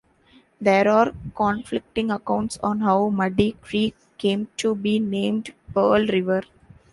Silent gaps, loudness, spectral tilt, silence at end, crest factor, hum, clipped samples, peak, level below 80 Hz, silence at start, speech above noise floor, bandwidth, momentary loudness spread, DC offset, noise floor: none; -22 LUFS; -6 dB/octave; 0.5 s; 18 dB; none; under 0.1%; -4 dBFS; -50 dBFS; 0.6 s; 35 dB; 11.5 kHz; 8 LU; under 0.1%; -56 dBFS